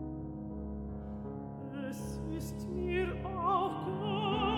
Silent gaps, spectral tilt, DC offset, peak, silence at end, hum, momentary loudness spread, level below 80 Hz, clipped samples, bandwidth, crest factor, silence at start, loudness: none; -6.5 dB/octave; under 0.1%; -20 dBFS; 0 s; none; 11 LU; -48 dBFS; under 0.1%; 17.5 kHz; 16 dB; 0 s; -37 LUFS